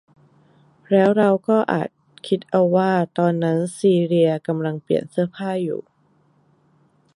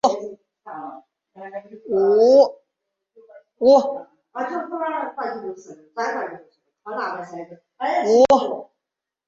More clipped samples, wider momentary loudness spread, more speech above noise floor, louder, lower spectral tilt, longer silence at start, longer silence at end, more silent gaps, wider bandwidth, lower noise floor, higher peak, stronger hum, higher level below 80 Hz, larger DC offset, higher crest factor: neither; second, 8 LU vs 22 LU; second, 41 dB vs 66 dB; about the same, -20 LUFS vs -19 LUFS; first, -7.5 dB/octave vs -4.5 dB/octave; first, 0.9 s vs 0.05 s; first, 1.35 s vs 0.65 s; neither; first, 11.5 kHz vs 7.6 kHz; second, -60 dBFS vs -85 dBFS; about the same, -4 dBFS vs -4 dBFS; neither; about the same, -68 dBFS vs -64 dBFS; neither; about the same, 18 dB vs 18 dB